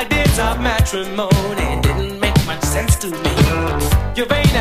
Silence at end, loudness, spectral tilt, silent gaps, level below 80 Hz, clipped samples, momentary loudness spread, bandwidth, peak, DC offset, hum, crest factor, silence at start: 0 s; -17 LUFS; -5 dB/octave; none; -22 dBFS; under 0.1%; 4 LU; 15.5 kHz; 0 dBFS; under 0.1%; none; 16 dB; 0 s